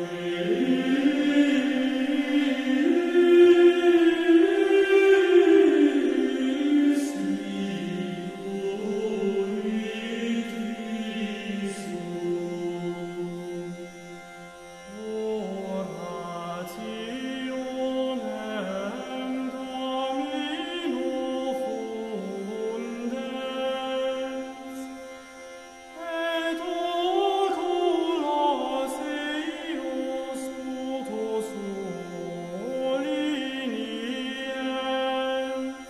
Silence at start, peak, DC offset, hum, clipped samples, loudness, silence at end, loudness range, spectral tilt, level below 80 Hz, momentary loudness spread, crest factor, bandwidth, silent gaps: 0 s; -8 dBFS; under 0.1%; none; under 0.1%; -26 LUFS; 0 s; 13 LU; -5.5 dB/octave; -66 dBFS; 15 LU; 18 dB; 13 kHz; none